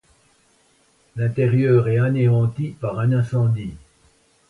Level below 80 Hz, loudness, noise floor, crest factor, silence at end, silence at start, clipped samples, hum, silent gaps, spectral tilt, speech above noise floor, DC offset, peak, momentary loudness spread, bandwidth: -52 dBFS; -20 LUFS; -59 dBFS; 16 dB; 0.75 s; 1.15 s; under 0.1%; none; none; -9.5 dB/octave; 41 dB; under 0.1%; -6 dBFS; 10 LU; 4.5 kHz